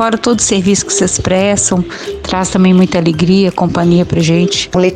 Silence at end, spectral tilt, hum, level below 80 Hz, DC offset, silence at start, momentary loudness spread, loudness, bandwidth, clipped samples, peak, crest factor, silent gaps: 0 s; -4.5 dB/octave; none; -34 dBFS; 0.1%; 0 s; 6 LU; -11 LUFS; 10 kHz; under 0.1%; 0 dBFS; 10 dB; none